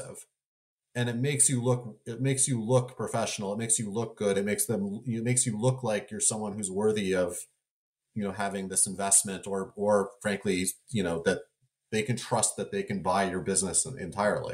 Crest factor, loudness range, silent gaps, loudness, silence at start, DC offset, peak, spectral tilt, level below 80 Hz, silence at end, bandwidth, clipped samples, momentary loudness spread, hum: 18 dB; 2 LU; 0.46-0.78 s, 7.70-7.95 s; -28 LUFS; 0 s; under 0.1%; -12 dBFS; -4 dB/octave; -64 dBFS; 0 s; 16 kHz; under 0.1%; 10 LU; none